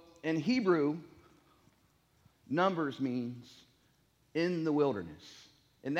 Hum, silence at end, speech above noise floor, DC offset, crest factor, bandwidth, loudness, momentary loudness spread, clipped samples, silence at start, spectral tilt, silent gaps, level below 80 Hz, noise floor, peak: none; 0 s; 38 dB; under 0.1%; 20 dB; 8.4 kHz; -33 LUFS; 17 LU; under 0.1%; 0.25 s; -7 dB/octave; none; -74 dBFS; -70 dBFS; -16 dBFS